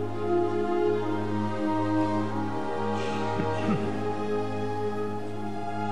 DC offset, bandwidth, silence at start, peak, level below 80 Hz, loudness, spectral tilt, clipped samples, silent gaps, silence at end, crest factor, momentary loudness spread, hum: 2%; 12 kHz; 0 s; -14 dBFS; -60 dBFS; -29 LUFS; -7.5 dB/octave; under 0.1%; none; 0 s; 14 dB; 6 LU; none